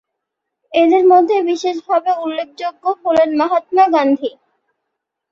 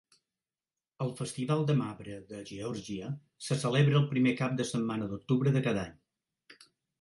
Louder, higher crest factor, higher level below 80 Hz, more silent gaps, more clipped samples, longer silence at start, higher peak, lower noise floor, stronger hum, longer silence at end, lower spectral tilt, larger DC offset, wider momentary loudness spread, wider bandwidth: first, -15 LUFS vs -31 LUFS; about the same, 14 dB vs 18 dB; about the same, -62 dBFS vs -66 dBFS; neither; neither; second, 0.7 s vs 1 s; first, -2 dBFS vs -14 dBFS; second, -78 dBFS vs under -90 dBFS; neither; first, 1.05 s vs 0.5 s; second, -4.5 dB/octave vs -6.5 dB/octave; neither; second, 11 LU vs 15 LU; second, 7.4 kHz vs 11.5 kHz